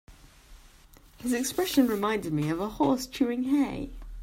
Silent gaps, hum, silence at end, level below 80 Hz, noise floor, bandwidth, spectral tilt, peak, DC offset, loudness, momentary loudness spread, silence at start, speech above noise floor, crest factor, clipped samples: none; none; 0 s; -48 dBFS; -55 dBFS; 16 kHz; -5 dB/octave; -12 dBFS; under 0.1%; -28 LUFS; 7 LU; 0.1 s; 28 dB; 18 dB; under 0.1%